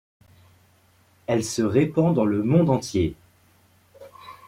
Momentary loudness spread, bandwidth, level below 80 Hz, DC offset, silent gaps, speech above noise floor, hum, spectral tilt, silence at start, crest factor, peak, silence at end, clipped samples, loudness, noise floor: 15 LU; 15 kHz; -54 dBFS; under 0.1%; none; 38 dB; none; -6.5 dB/octave; 1.3 s; 18 dB; -6 dBFS; 0.15 s; under 0.1%; -22 LUFS; -59 dBFS